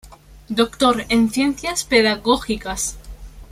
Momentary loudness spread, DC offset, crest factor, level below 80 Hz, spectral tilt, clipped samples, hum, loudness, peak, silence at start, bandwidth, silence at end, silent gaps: 9 LU; under 0.1%; 18 dB; -40 dBFS; -3 dB/octave; under 0.1%; none; -19 LUFS; -2 dBFS; 0.05 s; 15.5 kHz; 0.05 s; none